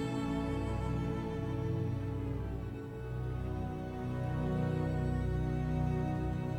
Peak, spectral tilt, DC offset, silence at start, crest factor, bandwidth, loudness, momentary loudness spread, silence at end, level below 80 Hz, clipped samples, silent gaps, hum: -22 dBFS; -8.5 dB/octave; under 0.1%; 0 s; 14 dB; 12 kHz; -36 LUFS; 6 LU; 0 s; -44 dBFS; under 0.1%; none; none